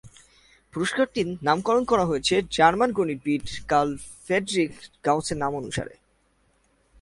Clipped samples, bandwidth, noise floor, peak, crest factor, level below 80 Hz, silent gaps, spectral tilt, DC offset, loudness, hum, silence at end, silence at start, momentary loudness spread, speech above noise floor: under 0.1%; 11.5 kHz; -66 dBFS; -4 dBFS; 22 dB; -52 dBFS; none; -4.5 dB/octave; under 0.1%; -24 LUFS; none; 1.1 s; 0.05 s; 10 LU; 42 dB